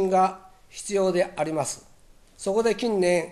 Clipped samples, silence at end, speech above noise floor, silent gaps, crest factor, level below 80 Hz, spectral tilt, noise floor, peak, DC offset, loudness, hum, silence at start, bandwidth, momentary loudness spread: under 0.1%; 0 s; 29 dB; none; 16 dB; -56 dBFS; -4.5 dB/octave; -53 dBFS; -10 dBFS; under 0.1%; -25 LUFS; none; 0 s; 13 kHz; 15 LU